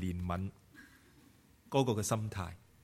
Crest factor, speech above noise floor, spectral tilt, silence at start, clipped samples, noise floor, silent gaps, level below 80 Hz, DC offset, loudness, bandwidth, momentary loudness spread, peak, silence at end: 22 dB; 28 dB; -5.5 dB/octave; 0 s; under 0.1%; -63 dBFS; none; -58 dBFS; under 0.1%; -36 LUFS; 16 kHz; 25 LU; -14 dBFS; 0.25 s